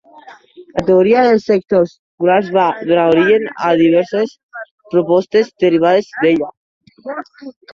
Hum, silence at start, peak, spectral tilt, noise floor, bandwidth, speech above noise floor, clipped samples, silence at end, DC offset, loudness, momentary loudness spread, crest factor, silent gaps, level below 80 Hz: none; 0.25 s; 0 dBFS; -7 dB/octave; -41 dBFS; 7.2 kHz; 27 dB; under 0.1%; 0.25 s; under 0.1%; -14 LUFS; 16 LU; 14 dB; 1.99-2.18 s, 4.43-4.49 s, 4.71-4.78 s, 6.57-6.81 s; -54 dBFS